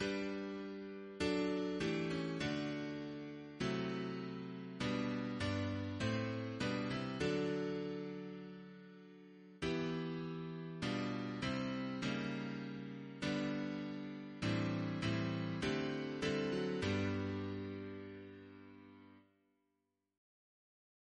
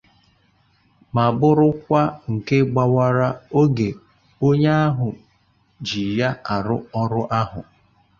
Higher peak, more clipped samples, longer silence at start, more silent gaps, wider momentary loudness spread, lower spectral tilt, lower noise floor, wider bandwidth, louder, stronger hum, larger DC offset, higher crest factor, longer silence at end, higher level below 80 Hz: second, -24 dBFS vs -4 dBFS; neither; second, 0 s vs 1.15 s; neither; about the same, 13 LU vs 11 LU; second, -6 dB/octave vs -8 dB/octave; first, -86 dBFS vs -61 dBFS; first, 10 kHz vs 7 kHz; second, -41 LUFS vs -20 LUFS; neither; neither; about the same, 16 dB vs 18 dB; first, 1.95 s vs 0.6 s; second, -66 dBFS vs -50 dBFS